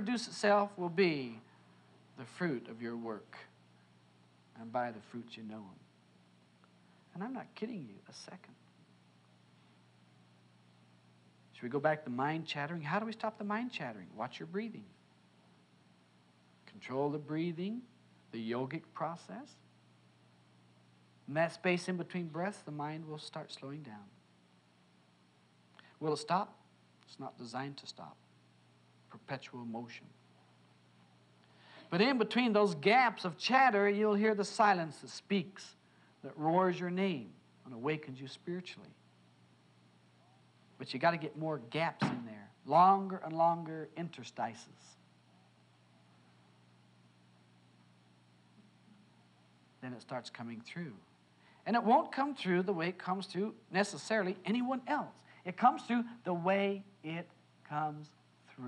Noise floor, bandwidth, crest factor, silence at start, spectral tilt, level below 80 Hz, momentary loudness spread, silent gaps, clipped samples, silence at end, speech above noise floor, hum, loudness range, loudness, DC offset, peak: -68 dBFS; 11 kHz; 24 dB; 0 s; -5.5 dB/octave; under -90 dBFS; 21 LU; none; under 0.1%; 0 s; 32 dB; 60 Hz at -65 dBFS; 17 LU; -35 LUFS; under 0.1%; -14 dBFS